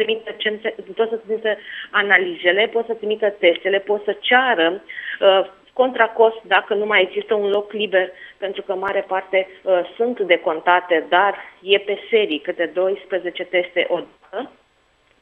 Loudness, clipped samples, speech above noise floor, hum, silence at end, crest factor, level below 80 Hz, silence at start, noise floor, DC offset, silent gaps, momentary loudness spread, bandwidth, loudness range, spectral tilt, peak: -19 LUFS; under 0.1%; 41 dB; none; 0.75 s; 20 dB; -68 dBFS; 0 s; -60 dBFS; under 0.1%; none; 11 LU; 4.1 kHz; 4 LU; -6 dB/octave; 0 dBFS